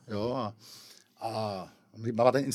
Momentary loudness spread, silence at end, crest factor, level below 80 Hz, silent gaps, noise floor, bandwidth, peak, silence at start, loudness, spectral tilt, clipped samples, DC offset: 23 LU; 0 s; 24 dB; -72 dBFS; none; -54 dBFS; 14.5 kHz; -8 dBFS; 0.05 s; -32 LUFS; -6 dB/octave; under 0.1%; under 0.1%